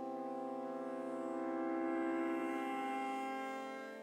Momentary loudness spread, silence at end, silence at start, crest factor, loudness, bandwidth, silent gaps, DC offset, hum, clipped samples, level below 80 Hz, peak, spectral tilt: 6 LU; 0 s; 0 s; 12 dB; -41 LUFS; 15.5 kHz; none; under 0.1%; none; under 0.1%; under -90 dBFS; -28 dBFS; -5 dB/octave